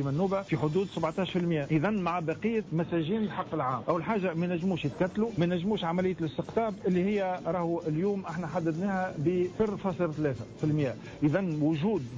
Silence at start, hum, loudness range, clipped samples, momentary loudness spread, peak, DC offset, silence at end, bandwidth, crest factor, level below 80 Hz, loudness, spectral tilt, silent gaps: 0 s; none; 1 LU; under 0.1%; 3 LU; -16 dBFS; under 0.1%; 0 s; 7.8 kHz; 12 dB; -58 dBFS; -30 LUFS; -8 dB/octave; none